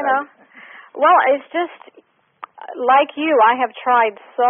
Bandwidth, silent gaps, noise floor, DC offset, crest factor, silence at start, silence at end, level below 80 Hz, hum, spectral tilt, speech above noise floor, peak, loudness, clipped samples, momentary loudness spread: 3.7 kHz; none; -42 dBFS; under 0.1%; 16 dB; 0 s; 0 s; -76 dBFS; none; 5 dB/octave; 26 dB; -2 dBFS; -16 LUFS; under 0.1%; 19 LU